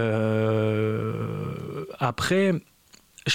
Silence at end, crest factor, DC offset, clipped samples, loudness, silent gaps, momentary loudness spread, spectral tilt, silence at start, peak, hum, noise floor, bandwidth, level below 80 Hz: 0 s; 16 dB; under 0.1%; under 0.1%; -26 LUFS; none; 10 LU; -6 dB/octave; 0 s; -10 dBFS; none; -55 dBFS; 16 kHz; -56 dBFS